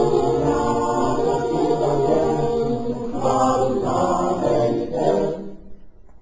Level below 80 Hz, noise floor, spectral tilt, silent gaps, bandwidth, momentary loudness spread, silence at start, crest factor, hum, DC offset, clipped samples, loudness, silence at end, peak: -42 dBFS; -40 dBFS; -7 dB/octave; none; 7.8 kHz; 5 LU; 0 s; 14 dB; none; 0.7%; under 0.1%; -20 LUFS; 0.3 s; -6 dBFS